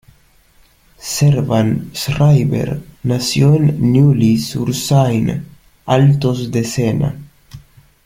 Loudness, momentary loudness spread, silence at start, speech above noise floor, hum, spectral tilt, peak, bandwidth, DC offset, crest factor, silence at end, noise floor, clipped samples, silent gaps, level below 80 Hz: -15 LUFS; 11 LU; 1 s; 37 dB; none; -6.5 dB/octave; 0 dBFS; 16 kHz; under 0.1%; 14 dB; 0.45 s; -51 dBFS; under 0.1%; none; -42 dBFS